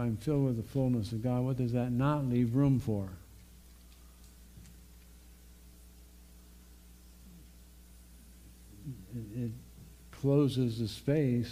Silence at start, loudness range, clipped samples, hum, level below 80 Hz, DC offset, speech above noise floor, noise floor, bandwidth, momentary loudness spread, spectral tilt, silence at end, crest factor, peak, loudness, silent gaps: 0 s; 25 LU; under 0.1%; none; -54 dBFS; under 0.1%; 25 dB; -55 dBFS; 15.5 kHz; 24 LU; -8 dB/octave; 0 s; 18 dB; -16 dBFS; -32 LUFS; none